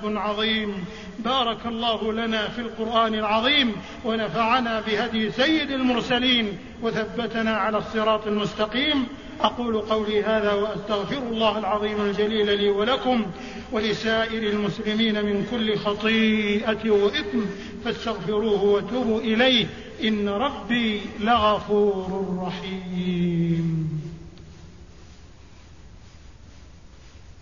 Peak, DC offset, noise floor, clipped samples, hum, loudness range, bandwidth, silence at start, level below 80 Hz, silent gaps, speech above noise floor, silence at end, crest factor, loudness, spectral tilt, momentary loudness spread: -6 dBFS; 0.3%; -47 dBFS; under 0.1%; none; 4 LU; 7.4 kHz; 0 s; -48 dBFS; none; 24 dB; 0.1 s; 18 dB; -23 LUFS; -5.5 dB/octave; 9 LU